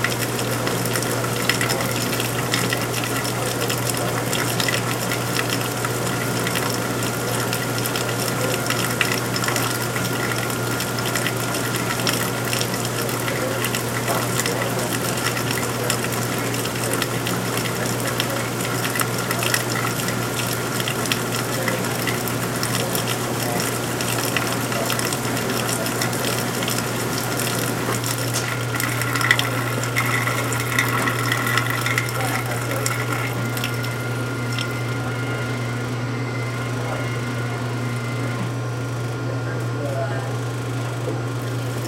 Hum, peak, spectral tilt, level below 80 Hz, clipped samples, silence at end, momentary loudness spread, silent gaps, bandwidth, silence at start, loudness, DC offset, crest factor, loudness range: none; 0 dBFS; -4 dB/octave; -50 dBFS; under 0.1%; 0 s; 5 LU; none; 17 kHz; 0 s; -22 LUFS; under 0.1%; 22 dB; 4 LU